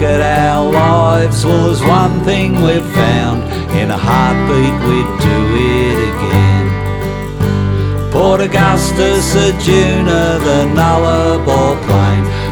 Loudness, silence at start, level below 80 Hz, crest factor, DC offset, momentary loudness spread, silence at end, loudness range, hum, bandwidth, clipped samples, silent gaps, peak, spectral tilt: -12 LUFS; 0 s; -24 dBFS; 10 dB; under 0.1%; 4 LU; 0 s; 2 LU; none; 20 kHz; under 0.1%; none; 0 dBFS; -6 dB/octave